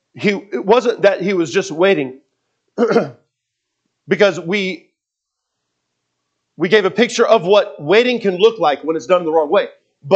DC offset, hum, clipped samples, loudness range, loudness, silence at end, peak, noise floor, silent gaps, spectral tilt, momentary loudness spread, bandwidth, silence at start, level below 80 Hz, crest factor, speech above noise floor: under 0.1%; none; under 0.1%; 7 LU; -15 LUFS; 0 s; 0 dBFS; -79 dBFS; none; -5 dB/octave; 9 LU; 8.6 kHz; 0.15 s; -70 dBFS; 16 dB; 65 dB